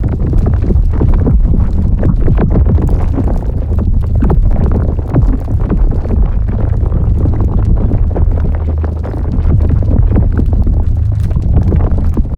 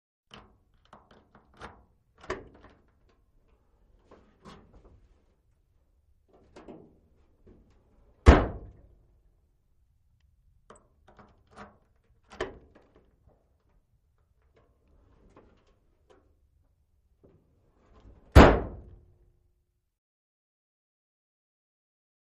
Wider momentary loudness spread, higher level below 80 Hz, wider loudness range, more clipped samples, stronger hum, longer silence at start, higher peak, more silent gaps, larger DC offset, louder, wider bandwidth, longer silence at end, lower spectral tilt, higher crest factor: second, 4 LU vs 33 LU; first, -12 dBFS vs -36 dBFS; second, 1 LU vs 22 LU; neither; neither; second, 0 s vs 2.3 s; about the same, 0 dBFS vs -2 dBFS; neither; neither; first, -13 LUFS vs -23 LUFS; second, 3 kHz vs 9.4 kHz; second, 0 s vs 3.6 s; first, -11 dB/octave vs -7 dB/octave; second, 10 dB vs 30 dB